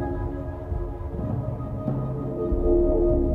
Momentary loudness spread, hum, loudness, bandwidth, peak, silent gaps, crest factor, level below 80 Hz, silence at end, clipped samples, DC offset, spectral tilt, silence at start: 10 LU; none; -27 LUFS; 3.3 kHz; -10 dBFS; none; 14 dB; -30 dBFS; 0 s; under 0.1%; under 0.1%; -12 dB/octave; 0 s